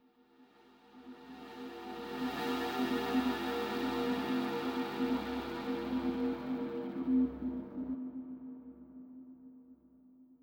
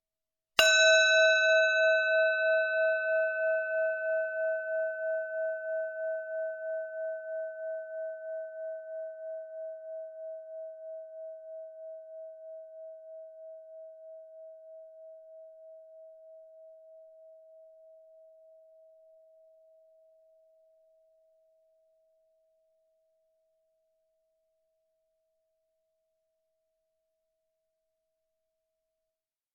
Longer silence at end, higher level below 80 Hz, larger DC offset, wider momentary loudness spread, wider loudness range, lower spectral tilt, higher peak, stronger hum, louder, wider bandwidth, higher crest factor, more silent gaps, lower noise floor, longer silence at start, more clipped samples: second, 0.05 s vs 11.9 s; first, -62 dBFS vs -78 dBFS; neither; second, 20 LU vs 27 LU; second, 4 LU vs 27 LU; first, -5.5 dB/octave vs 5 dB/octave; second, -22 dBFS vs -6 dBFS; neither; second, -36 LUFS vs -28 LUFS; first, 17.5 kHz vs 7.2 kHz; second, 14 dB vs 28 dB; neither; second, -64 dBFS vs under -90 dBFS; second, 0.4 s vs 0.6 s; neither